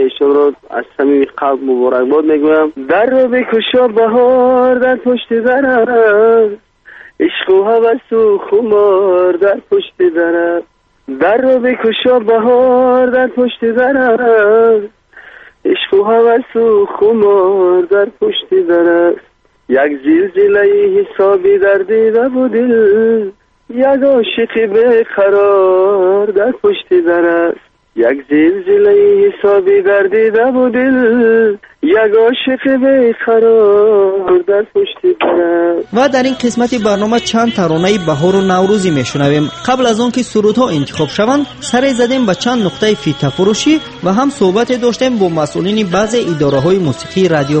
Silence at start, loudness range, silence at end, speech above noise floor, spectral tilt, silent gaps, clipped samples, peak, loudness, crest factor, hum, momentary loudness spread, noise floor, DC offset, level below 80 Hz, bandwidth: 0 s; 3 LU; 0 s; 27 dB; -5.5 dB/octave; none; under 0.1%; 0 dBFS; -11 LUFS; 10 dB; none; 6 LU; -37 dBFS; under 0.1%; -48 dBFS; 8.8 kHz